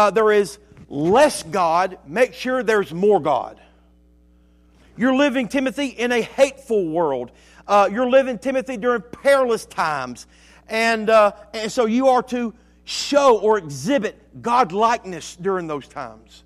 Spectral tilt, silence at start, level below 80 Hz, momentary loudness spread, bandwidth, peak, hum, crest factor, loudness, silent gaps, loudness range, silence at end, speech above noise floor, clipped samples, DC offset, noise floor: -4.5 dB/octave; 0 s; -54 dBFS; 13 LU; 14.5 kHz; -4 dBFS; none; 16 dB; -19 LUFS; none; 3 LU; 0.3 s; 34 dB; under 0.1%; under 0.1%; -54 dBFS